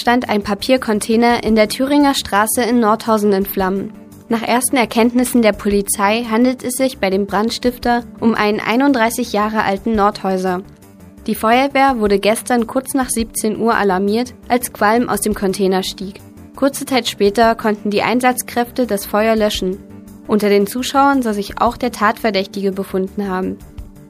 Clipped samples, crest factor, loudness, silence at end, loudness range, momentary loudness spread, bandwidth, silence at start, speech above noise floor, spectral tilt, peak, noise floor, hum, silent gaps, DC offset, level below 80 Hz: under 0.1%; 16 dB; -16 LUFS; 0.05 s; 2 LU; 7 LU; 15.5 kHz; 0 s; 24 dB; -4 dB/octave; 0 dBFS; -40 dBFS; none; none; under 0.1%; -42 dBFS